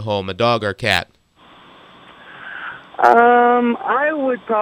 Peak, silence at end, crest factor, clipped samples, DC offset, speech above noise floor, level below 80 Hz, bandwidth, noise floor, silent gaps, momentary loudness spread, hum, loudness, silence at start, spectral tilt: 0 dBFS; 0 s; 18 dB; under 0.1%; under 0.1%; 32 dB; -56 dBFS; 14.5 kHz; -48 dBFS; none; 20 LU; none; -16 LUFS; 0 s; -5.5 dB/octave